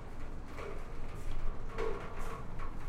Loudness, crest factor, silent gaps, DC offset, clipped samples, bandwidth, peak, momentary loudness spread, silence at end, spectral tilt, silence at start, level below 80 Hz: -44 LUFS; 14 dB; none; under 0.1%; under 0.1%; 8.6 kHz; -20 dBFS; 7 LU; 0 s; -6 dB/octave; 0 s; -38 dBFS